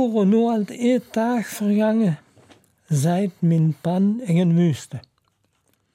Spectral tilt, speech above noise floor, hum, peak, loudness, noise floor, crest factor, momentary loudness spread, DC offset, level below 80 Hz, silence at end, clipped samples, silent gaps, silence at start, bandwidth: -7.5 dB/octave; 48 dB; none; -10 dBFS; -21 LUFS; -67 dBFS; 12 dB; 7 LU; under 0.1%; -68 dBFS; 0.95 s; under 0.1%; none; 0 s; 16 kHz